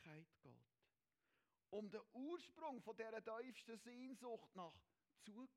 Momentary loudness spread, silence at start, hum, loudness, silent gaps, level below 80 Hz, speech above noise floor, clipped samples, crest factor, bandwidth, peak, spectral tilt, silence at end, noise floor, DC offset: 11 LU; 0 s; none; -56 LUFS; none; under -90 dBFS; over 35 dB; under 0.1%; 18 dB; 16 kHz; -38 dBFS; -5 dB/octave; 0.05 s; under -90 dBFS; under 0.1%